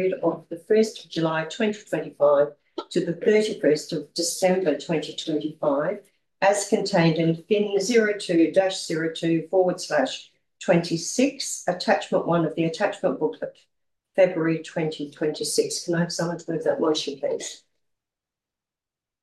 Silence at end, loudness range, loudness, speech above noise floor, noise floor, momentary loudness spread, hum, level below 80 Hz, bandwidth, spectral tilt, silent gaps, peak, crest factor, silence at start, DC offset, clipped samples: 1.65 s; 4 LU; -24 LUFS; 66 dB; -90 dBFS; 8 LU; none; -72 dBFS; 12.5 kHz; -4.5 dB/octave; none; -6 dBFS; 18 dB; 0 s; under 0.1%; under 0.1%